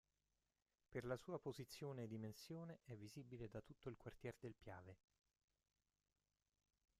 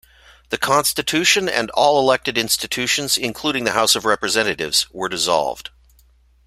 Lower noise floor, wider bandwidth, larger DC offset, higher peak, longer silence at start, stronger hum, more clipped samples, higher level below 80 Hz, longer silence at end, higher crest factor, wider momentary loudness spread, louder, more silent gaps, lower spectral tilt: first, under -90 dBFS vs -54 dBFS; second, 14.5 kHz vs 16 kHz; neither; second, -34 dBFS vs 0 dBFS; first, 0.9 s vs 0.5 s; neither; neither; second, -78 dBFS vs -52 dBFS; first, 2.05 s vs 0.8 s; about the same, 22 dB vs 20 dB; about the same, 9 LU vs 7 LU; second, -55 LUFS vs -18 LUFS; neither; first, -6.5 dB/octave vs -1.5 dB/octave